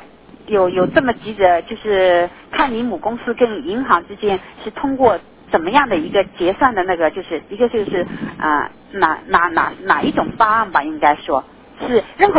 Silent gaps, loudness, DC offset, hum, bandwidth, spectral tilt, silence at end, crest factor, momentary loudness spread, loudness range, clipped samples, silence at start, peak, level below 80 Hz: none; -17 LUFS; under 0.1%; none; 4 kHz; -9 dB/octave; 0 s; 16 dB; 8 LU; 2 LU; under 0.1%; 0 s; 0 dBFS; -46 dBFS